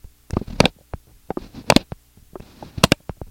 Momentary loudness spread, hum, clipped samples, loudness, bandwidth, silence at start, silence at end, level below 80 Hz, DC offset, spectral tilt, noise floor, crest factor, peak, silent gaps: 22 LU; none; under 0.1%; -20 LUFS; 17 kHz; 0.35 s; 0.05 s; -38 dBFS; under 0.1%; -4 dB/octave; -42 dBFS; 24 dB; 0 dBFS; none